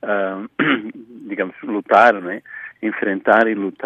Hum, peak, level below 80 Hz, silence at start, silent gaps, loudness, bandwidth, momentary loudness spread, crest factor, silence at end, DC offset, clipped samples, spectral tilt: none; 0 dBFS; -70 dBFS; 0.05 s; none; -18 LUFS; 8.4 kHz; 17 LU; 18 dB; 0 s; under 0.1%; under 0.1%; -6.5 dB/octave